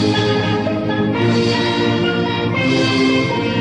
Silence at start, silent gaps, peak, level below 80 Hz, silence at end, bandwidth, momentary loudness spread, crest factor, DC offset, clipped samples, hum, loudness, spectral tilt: 0 s; none; -4 dBFS; -46 dBFS; 0 s; 10.5 kHz; 3 LU; 12 dB; under 0.1%; under 0.1%; none; -16 LUFS; -6 dB/octave